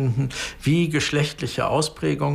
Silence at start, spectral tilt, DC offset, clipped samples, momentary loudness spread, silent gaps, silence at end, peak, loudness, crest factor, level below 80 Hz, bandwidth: 0 s; -5.5 dB/octave; under 0.1%; under 0.1%; 5 LU; none; 0 s; -8 dBFS; -23 LUFS; 14 dB; -46 dBFS; 15.5 kHz